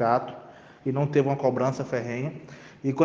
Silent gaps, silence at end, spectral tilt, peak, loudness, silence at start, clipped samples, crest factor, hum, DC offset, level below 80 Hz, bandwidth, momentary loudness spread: none; 0 s; -8 dB/octave; -6 dBFS; -27 LUFS; 0 s; under 0.1%; 20 dB; none; under 0.1%; -68 dBFS; 7.4 kHz; 18 LU